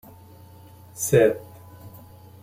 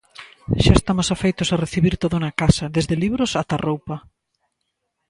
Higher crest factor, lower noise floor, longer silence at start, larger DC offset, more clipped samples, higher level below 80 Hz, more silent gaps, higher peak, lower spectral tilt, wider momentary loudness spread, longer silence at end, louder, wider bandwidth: about the same, 22 dB vs 20 dB; second, -47 dBFS vs -76 dBFS; first, 0.95 s vs 0.2 s; neither; neither; second, -58 dBFS vs -32 dBFS; neither; second, -4 dBFS vs 0 dBFS; about the same, -5.5 dB/octave vs -5.5 dB/octave; first, 26 LU vs 10 LU; second, 0.55 s vs 1.1 s; about the same, -21 LUFS vs -20 LUFS; first, 16.5 kHz vs 11.5 kHz